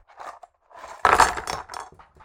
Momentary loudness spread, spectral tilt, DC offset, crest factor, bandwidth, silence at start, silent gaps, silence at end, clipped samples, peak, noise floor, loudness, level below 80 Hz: 24 LU; -2 dB/octave; under 0.1%; 24 dB; 16.5 kHz; 0.2 s; none; 0.4 s; under 0.1%; -2 dBFS; -48 dBFS; -21 LUFS; -46 dBFS